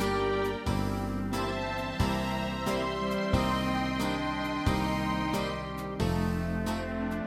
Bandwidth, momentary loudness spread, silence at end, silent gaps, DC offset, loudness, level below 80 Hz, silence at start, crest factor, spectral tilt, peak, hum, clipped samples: 16 kHz; 4 LU; 0 s; none; under 0.1%; -31 LUFS; -42 dBFS; 0 s; 16 dB; -6 dB/octave; -14 dBFS; none; under 0.1%